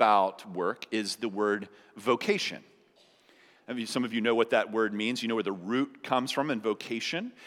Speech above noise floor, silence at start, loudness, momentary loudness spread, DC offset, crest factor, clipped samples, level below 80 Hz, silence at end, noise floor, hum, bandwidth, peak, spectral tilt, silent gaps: 33 dB; 0 s; -30 LUFS; 8 LU; under 0.1%; 22 dB; under 0.1%; -90 dBFS; 0 s; -63 dBFS; none; 16 kHz; -8 dBFS; -4 dB/octave; none